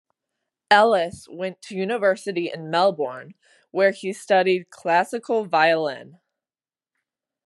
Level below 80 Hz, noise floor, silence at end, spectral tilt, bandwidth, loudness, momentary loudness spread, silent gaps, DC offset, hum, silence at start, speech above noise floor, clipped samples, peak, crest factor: -74 dBFS; under -90 dBFS; 1.4 s; -4.5 dB/octave; 12 kHz; -22 LUFS; 14 LU; none; under 0.1%; none; 0.7 s; over 68 dB; under 0.1%; -2 dBFS; 22 dB